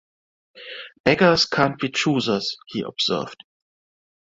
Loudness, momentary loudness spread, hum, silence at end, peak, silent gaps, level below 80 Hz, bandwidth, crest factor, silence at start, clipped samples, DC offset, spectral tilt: -21 LUFS; 19 LU; none; 0.9 s; -2 dBFS; 1.00-1.04 s; -56 dBFS; 7.8 kHz; 22 dB; 0.55 s; under 0.1%; under 0.1%; -4.5 dB/octave